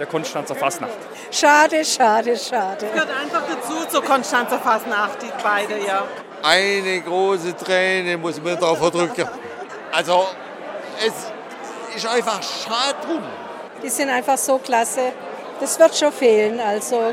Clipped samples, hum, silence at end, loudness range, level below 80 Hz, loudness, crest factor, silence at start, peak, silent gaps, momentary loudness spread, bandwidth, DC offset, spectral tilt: under 0.1%; none; 0 s; 5 LU; -68 dBFS; -19 LUFS; 18 dB; 0 s; -2 dBFS; none; 15 LU; 16.5 kHz; under 0.1%; -2.5 dB/octave